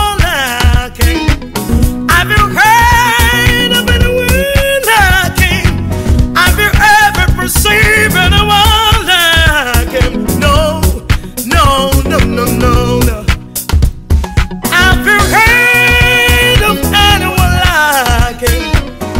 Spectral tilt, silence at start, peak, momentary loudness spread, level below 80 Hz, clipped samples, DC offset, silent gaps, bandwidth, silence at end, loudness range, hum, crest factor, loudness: -4 dB/octave; 0 s; 0 dBFS; 8 LU; -16 dBFS; 0.1%; 0.6%; none; 16.5 kHz; 0 s; 4 LU; none; 8 dB; -9 LUFS